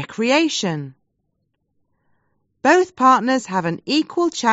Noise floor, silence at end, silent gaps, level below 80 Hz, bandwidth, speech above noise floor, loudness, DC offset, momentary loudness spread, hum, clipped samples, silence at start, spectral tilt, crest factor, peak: -72 dBFS; 0 s; none; -66 dBFS; 8 kHz; 54 dB; -18 LUFS; under 0.1%; 9 LU; none; under 0.1%; 0 s; -3 dB/octave; 18 dB; -2 dBFS